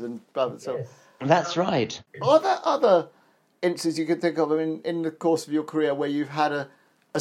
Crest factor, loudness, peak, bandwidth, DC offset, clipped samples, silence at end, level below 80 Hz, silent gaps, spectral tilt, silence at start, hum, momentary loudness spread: 20 dB; -25 LUFS; -4 dBFS; 13.5 kHz; under 0.1%; under 0.1%; 0 s; -74 dBFS; none; -5.5 dB/octave; 0 s; none; 12 LU